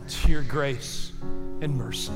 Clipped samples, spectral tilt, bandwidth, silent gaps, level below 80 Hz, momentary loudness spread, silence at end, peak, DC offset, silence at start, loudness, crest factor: under 0.1%; -4.5 dB/octave; 15 kHz; none; -30 dBFS; 10 LU; 0 s; -8 dBFS; under 0.1%; 0 s; -30 LUFS; 16 dB